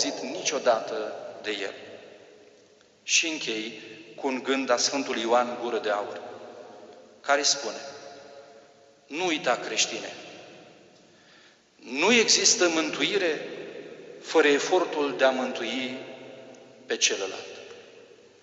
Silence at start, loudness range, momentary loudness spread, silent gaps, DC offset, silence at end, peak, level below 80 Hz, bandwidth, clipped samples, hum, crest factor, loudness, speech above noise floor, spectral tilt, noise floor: 0 s; 7 LU; 22 LU; none; under 0.1%; 0.35 s; -6 dBFS; -78 dBFS; 8.2 kHz; under 0.1%; none; 22 dB; -25 LUFS; 32 dB; -1 dB/octave; -58 dBFS